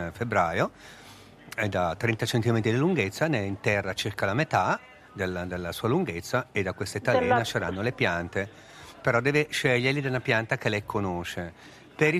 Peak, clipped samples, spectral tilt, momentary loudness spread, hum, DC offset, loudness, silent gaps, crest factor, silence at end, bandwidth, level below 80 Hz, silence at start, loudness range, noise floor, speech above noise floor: -8 dBFS; under 0.1%; -5.5 dB/octave; 10 LU; none; under 0.1%; -27 LUFS; none; 20 dB; 0 s; 15 kHz; -58 dBFS; 0 s; 2 LU; -47 dBFS; 20 dB